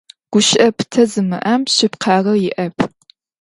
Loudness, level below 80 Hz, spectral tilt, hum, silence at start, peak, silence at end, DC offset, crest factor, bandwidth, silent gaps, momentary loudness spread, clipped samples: -15 LUFS; -58 dBFS; -4 dB/octave; none; 0.3 s; 0 dBFS; 0.55 s; under 0.1%; 16 dB; 11.5 kHz; none; 8 LU; under 0.1%